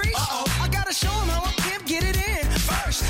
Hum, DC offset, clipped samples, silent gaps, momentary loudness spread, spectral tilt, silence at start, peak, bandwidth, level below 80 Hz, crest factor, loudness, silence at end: none; under 0.1%; under 0.1%; none; 1 LU; -3.5 dB/octave; 0 s; -6 dBFS; 17 kHz; -28 dBFS; 18 dB; -24 LUFS; 0 s